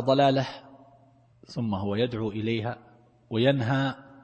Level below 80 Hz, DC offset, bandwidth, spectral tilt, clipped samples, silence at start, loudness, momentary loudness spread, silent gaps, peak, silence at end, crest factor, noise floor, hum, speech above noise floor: -62 dBFS; under 0.1%; 8.4 kHz; -7.5 dB/octave; under 0.1%; 0 s; -27 LUFS; 13 LU; none; -8 dBFS; 0.15 s; 18 dB; -59 dBFS; none; 33 dB